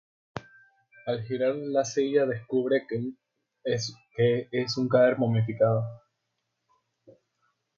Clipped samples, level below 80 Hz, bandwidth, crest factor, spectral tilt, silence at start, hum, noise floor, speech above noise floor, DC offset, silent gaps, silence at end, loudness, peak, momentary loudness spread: under 0.1%; -66 dBFS; 7.6 kHz; 18 dB; -6 dB/octave; 0.35 s; none; -80 dBFS; 54 dB; under 0.1%; none; 1.8 s; -27 LUFS; -10 dBFS; 16 LU